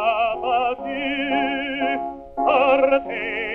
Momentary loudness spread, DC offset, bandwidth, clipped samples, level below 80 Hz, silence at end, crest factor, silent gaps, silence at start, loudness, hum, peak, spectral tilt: 9 LU; under 0.1%; 4.8 kHz; under 0.1%; -52 dBFS; 0 s; 16 dB; none; 0 s; -21 LUFS; none; -4 dBFS; -6 dB/octave